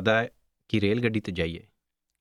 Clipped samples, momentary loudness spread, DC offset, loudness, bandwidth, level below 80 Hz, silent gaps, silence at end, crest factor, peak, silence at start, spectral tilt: under 0.1%; 10 LU; under 0.1%; -28 LUFS; 11.5 kHz; -52 dBFS; none; 0.6 s; 20 dB; -8 dBFS; 0 s; -7 dB/octave